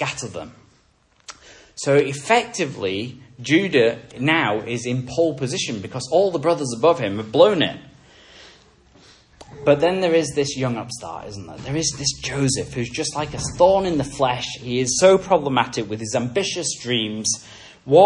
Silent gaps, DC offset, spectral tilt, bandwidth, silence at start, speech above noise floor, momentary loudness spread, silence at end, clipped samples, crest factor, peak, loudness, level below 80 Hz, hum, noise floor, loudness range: none; under 0.1%; -4 dB/octave; 11 kHz; 0 s; 39 dB; 16 LU; 0 s; under 0.1%; 20 dB; 0 dBFS; -20 LUFS; -50 dBFS; none; -59 dBFS; 4 LU